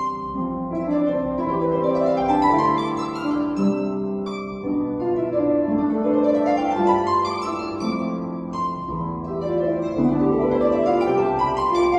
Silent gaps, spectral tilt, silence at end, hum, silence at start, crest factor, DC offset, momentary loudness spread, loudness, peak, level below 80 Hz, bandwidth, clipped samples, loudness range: none; -7.5 dB/octave; 0 s; none; 0 s; 16 dB; under 0.1%; 8 LU; -22 LUFS; -6 dBFS; -46 dBFS; 8.6 kHz; under 0.1%; 3 LU